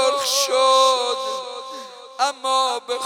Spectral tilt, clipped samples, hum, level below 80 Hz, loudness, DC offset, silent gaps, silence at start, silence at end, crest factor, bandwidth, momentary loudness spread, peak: 1.5 dB/octave; under 0.1%; none; -88 dBFS; -19 LUFS; under 0.1%; none; 0 s; 0 s; 16 dB; 17.5 kHz; 18 LU; -4 dBFS